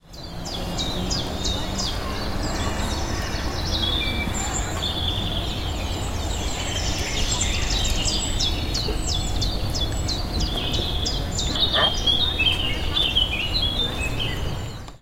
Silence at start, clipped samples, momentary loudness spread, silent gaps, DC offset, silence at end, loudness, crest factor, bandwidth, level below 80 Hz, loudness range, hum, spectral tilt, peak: 0.05 s; under 0.1%; 8 LU; none; under 0.1%; 0.05 s; -23 LUFS; 18 dB; 16.5 kHz; -30 dBFS; 5 LU; none; -3 dB/octave; -6 dBFS